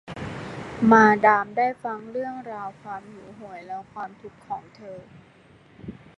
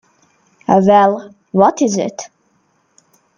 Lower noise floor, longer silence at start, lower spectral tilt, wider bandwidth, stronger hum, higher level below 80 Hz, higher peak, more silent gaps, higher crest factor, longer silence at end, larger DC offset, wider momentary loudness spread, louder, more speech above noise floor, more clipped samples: second, -53 dBFS vs -60 dBFS; second, 0.05 s vs 0.7 s; about the same, -6.5 dB/octave vs -6 dB/octave; second, 8 kHz vs 9.4 kHz; neither; about the same, -58 dBFS vs -58 dBFS; about the same, -2 dBFS vs 0 dBFS; neither; first, 24 dB vs 16 dB; second, 0.25 s vs 1.1 s; neither; first, 26 LU vs 18 LU; second, -21 LUFS vs -14 LUFS; second, 30 dB vs 48 dB; neither